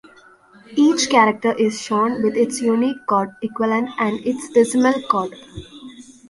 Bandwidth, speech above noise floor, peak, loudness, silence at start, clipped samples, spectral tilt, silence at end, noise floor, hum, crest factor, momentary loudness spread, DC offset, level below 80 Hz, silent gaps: 11.5 kHz; 30 dB; -2 dBFS; -18 LUFS; 0.7 s; under 0.1%; -4 dB/octave; 0.3 s; -49 dBFS; none; 18 dB; 14 LU; under 0.1%; -56 dBFS; none